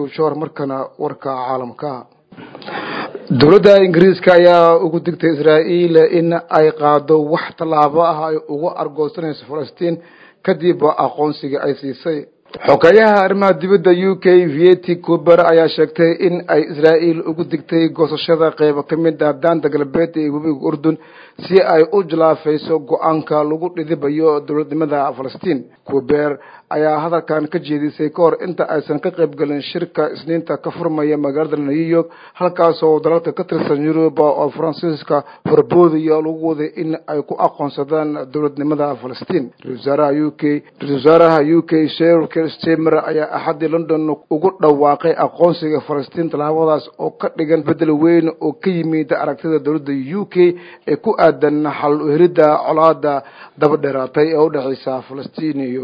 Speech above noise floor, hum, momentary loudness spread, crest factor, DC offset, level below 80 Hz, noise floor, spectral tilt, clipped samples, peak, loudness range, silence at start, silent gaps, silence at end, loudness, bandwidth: 22 dB; none; 11 LU; 14 dB; under 0.1%; -58 dBFS; -37 dBFS; -8.5 dB/octave; 0.1%; 0 dBFS; 7 LU; 0 s; none; 0 s; -15 LUFS; 6.2 kHz